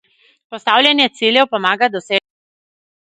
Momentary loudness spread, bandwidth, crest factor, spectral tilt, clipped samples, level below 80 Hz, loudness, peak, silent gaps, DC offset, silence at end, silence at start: 9 LU; 11 kHz; 18 dB; -3.5 dB/octave; under 0.1%; -70 dBFS; -14 LUFS; 0 dBFS; none; under 0.1%; 0.9 s; 0.5 s